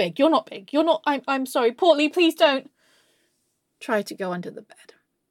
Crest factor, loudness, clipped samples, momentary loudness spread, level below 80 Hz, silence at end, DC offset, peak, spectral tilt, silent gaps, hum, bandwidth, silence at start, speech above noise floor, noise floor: 18 dB; -22 LUFS; under 0.1%; 12 LU; -78 dBFS; 0.7 s; under 0.1%; -6 dBFS; -4.5 dB/octave; none; none; 17 kHz; 0 s; 51 dB; -73 dBFS